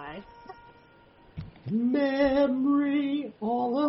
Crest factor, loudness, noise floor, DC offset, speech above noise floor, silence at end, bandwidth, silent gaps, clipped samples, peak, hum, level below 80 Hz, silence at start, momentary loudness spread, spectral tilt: 14 dB; -26 LUFS; -56 dBFS; under 0.1%; 31 dB; 0 s; 6 kHz; none; under 0.1%; -14 dBFS; none; -56 dBFS; 0 s; 22 LU; -9 dB/octave